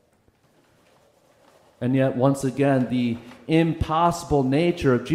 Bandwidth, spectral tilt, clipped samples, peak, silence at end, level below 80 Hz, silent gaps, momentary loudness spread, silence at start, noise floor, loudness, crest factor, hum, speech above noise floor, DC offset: 15 kHz; -7 dB/octave; under 0.1%; -6 dBFS; 0 s; -46 dBFS; none; 5 LU; 1.8 s; -62 dBFS; -22 LUFS; 16 dB; none; 41 dB; under 0.1%